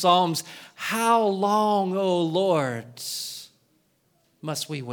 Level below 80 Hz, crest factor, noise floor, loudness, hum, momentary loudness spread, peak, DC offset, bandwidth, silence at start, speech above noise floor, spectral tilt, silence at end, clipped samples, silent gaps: -76 dBFS; 18 dB; -67 dBFS; -24 LUFS; none; 13 LU; -6 dBFS; under 0.1%; over 20 kHz; 0 s; 43 dB; -4.5 dB/octave; 0 s; under 0.1%; none